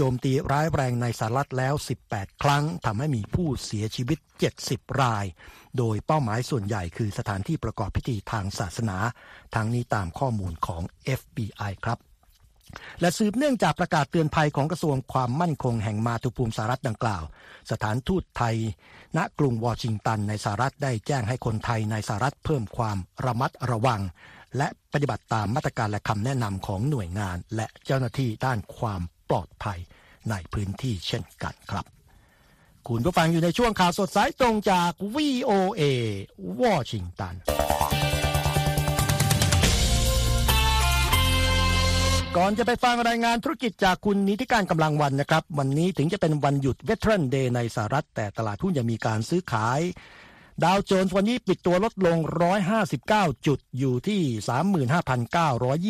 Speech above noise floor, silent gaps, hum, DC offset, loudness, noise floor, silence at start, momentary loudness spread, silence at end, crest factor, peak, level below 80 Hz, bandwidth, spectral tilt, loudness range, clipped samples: 33 dB; none; none; under 0.1%; -26 LUFS; -59 dBFS; 0 s; 10 LU; 0 s; 22 dB; -4 dBFS; -38 dBFS; 15.5 kHz; -5.5 dB/octave; 7 LU; under 0.1%